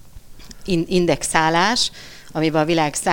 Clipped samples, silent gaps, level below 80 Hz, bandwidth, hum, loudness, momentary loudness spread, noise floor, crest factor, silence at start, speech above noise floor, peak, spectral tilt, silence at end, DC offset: under 0.1%; none; -42 dBFS; 17 kHz; none; -19 LUFS; 11 LU; -40 dBFS; 18 dB; 0 s; 22 dB; -2 dBFS; -4 dB/octave; 0 s; under 0.1%